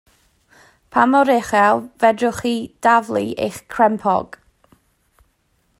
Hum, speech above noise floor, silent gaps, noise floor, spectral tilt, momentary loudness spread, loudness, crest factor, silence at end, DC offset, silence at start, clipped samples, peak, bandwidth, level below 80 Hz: none; 47 dB; none; -64 dBFS; -5 dB/octave; 9 LU; -17 LUFS; 18 dB; 1.55 s; under 0.1%; 0.95 s; under 0.1%; 0 dBFS; 16 kHz; -56 dBFS